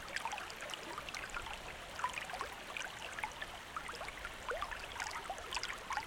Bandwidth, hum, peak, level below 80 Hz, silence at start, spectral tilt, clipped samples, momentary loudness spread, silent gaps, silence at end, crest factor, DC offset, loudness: 19 kHz; none; -22 dBFS; -60 dBFS; 0 s; -1.5 dB/octave; under 0.1%; 4 LU; none; 0 s; 22 dB; under 0.1%; -43 LUFS